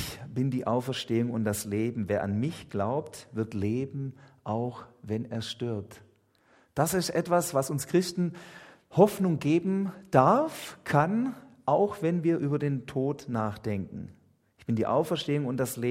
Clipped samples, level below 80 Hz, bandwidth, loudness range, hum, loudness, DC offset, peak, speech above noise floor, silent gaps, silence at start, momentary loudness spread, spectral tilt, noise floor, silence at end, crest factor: under 0.1%; -64 dBFS; 16 kHz; 7 LU; none; -29 LUFS; under 0.1%; -6 dBFS; 36 dB; none; 0 s; 13 LU; -6 dB/octave; -64 dBFS; 0 s; 24 dB